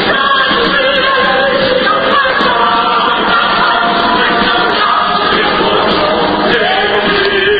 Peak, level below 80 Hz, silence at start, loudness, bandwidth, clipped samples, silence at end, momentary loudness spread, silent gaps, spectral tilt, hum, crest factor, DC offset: 0 dBFS; -38 dBFS; 0 s; -10 LUFS; 8 kHz; under 0.1%; 0 s; 1 LU; none; -6 dB/octave; none; 10 dB; under 0.1%